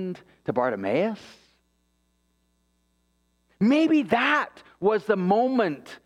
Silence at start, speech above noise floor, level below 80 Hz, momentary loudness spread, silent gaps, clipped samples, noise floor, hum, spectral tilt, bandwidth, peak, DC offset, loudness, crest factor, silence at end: 0 s; 46 dB; -68 dBFS; 12 LU; none; under 0.1%; -70 dBFS; none; -7 dB/octave; 10.5 kHz; -8 dBFS; under 0.1%; -24 LUFS; 18 dB; 0.1 s